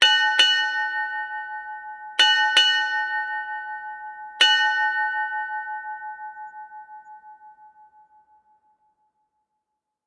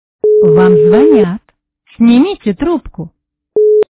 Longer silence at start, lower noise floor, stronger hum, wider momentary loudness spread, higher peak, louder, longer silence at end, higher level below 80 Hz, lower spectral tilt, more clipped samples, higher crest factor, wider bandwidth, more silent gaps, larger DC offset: second, 0 s vs 0.25 s; first, -81 dBFS vs -54 dBFS; neither; first, 21 LU vs 18 LU; second, -4 dBFS vs 0 dBFS; second, -20 LUFS vs -10 LUFS; first, 2.4 s vs 0.1 s; second, -80 dBFS vs -40 dBFS; second, 3.5 dB/octave vs -12 dB/octave; neither; first, 22 dB vs 10 dB; first, 11.5 kHz vs 4 kHz; neither; neither